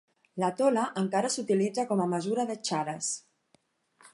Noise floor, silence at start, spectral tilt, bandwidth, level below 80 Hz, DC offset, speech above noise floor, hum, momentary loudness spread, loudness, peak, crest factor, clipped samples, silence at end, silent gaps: -70 dBFS; 0.35 s; -4.5 dB/octave; 11.5 kHz; -80 dBFS; under 0.1%; 41 dB; none; 6 LU; -29 LUFS; -12 dBFS; 18 dB; under 0.1%; 0.95 s; none